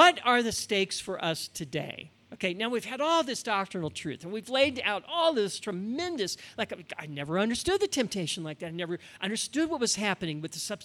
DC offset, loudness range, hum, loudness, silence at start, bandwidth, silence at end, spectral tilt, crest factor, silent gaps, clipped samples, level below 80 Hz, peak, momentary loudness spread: under 0.1%; 2 LU; none; -30 LUFS; 0 s; 17 kHz; 0 s; -3 dB/octave; 24 dB; none; under 0.1%; -64 dBFS; -6 dBFS; 10 LU